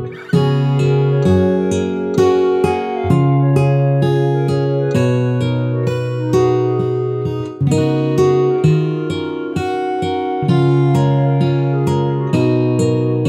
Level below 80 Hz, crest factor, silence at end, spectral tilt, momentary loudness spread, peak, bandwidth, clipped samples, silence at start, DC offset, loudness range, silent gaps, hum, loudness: -46 dBFS; 14 dB; 0 s; -8 dB/octave; 6 LU; 0 dBFS; 10.5 kHz; under 0.1%; 0 s; under 0.1%; 2 LU; none; none; -16 LUFS